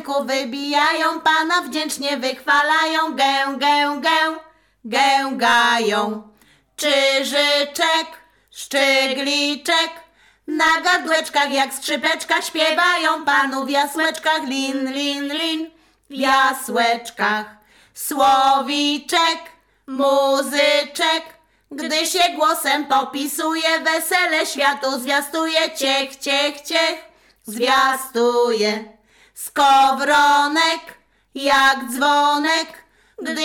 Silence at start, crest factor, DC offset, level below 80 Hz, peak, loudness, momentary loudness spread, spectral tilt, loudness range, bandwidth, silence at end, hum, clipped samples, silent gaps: 0 s; 14 dB; under 0.1%; -64 dBFS; -4 dBFS; -18 LUFS; 9 LU; -1 dB/octave; 3 LU; 18 kHz; 0 s; none; under 0.1%; none